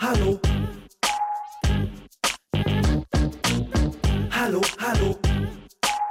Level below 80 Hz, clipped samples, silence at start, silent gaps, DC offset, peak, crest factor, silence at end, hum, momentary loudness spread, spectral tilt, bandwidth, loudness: -30 dBFS; under 0.1%; 0 s; none; under 0.1%; -10 dBFS; 14 dB; 0 s; none; 5 LU; -5 dB/octave; 16.5 kHz; -25 LUFS